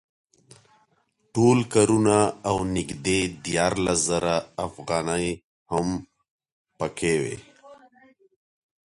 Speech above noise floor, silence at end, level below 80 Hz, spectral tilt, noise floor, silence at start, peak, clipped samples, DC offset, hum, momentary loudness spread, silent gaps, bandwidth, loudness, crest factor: 45 dB; 1.1 s; -50 dBFS; -4.5 dB/octave; -69 dBFS; 1.35 s; -6 dBFS; under 0.1%; under 0.1%; none; 13 LU; 5.44-5.66 s, 6.31-6.39 s, 6.52-6.65 s; 11.5 kHz; -24 LUFS; 20 dB